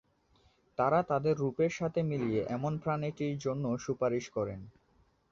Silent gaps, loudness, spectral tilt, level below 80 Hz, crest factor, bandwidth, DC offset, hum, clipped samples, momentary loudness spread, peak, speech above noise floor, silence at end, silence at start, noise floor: none; -33 LUFS; -7 dB/octave; -64 dBFS; 18 dB; 7.6 kHz; under 0.1%; none; under 0.1%; 7 LU; -16 dBFS; 37 dB; 0.6 s; 0.8 s; -69 dBFS